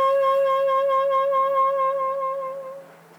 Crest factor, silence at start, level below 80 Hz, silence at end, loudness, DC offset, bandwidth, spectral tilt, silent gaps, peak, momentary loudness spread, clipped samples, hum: 10 dB; 0 s; -88 dBFS; 0.35 s; -21 LUFS; under 0.1%; 15 kHz; -3.5 dB/octave; none; -12 dBFS; 13 LU; under 0.1%; none